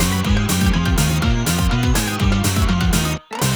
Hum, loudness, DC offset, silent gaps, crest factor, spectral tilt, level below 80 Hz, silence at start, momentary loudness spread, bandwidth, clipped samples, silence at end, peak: none; -18 LUFS; under 0.1%; none; 12 dB; -4.5 dB/octave; -22 dBFS; 0 s; 1 LU; over 20 kHz; under 0.1%; 0 s; -4 dBFS